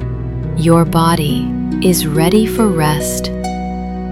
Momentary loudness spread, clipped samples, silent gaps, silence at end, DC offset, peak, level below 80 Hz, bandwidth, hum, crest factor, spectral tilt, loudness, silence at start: 10 LU; under 0.1%; none; 0 s; under 0.1%; 0 dBFS; -28 dBFS; 16.5 kHz; none; 14 dB; -5.5 dB/octave; -14 LUFS; 0 s